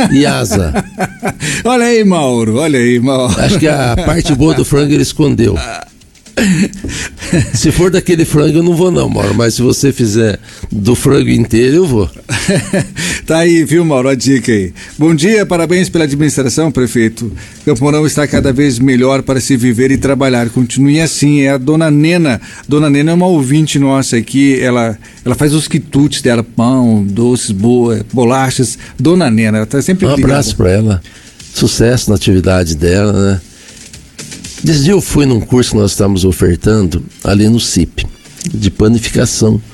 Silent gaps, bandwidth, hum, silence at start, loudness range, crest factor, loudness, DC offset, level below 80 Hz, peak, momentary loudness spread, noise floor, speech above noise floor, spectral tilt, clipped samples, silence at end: none; 17 kHz; none; 0 s; 2 LU; 10 dB; -11 LUFS; under 0.1%; -30 dBFS; 0 dBFS; 7 LU; -33 dBFS; 23 dB; -5.5 dB/octave; under 0.1%; 0.05 s